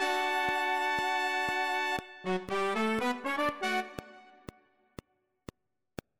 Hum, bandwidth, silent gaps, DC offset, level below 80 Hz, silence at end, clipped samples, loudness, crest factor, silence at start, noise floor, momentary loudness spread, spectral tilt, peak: none; 16 kHz; none; under 0.1%; -64 dBFS; 1.8 s; under 0.1%; -31 LUFS; 16 dB; 0 s; -53 dBFS; 19 LU; -3.5 dB/octave; -18 dBFS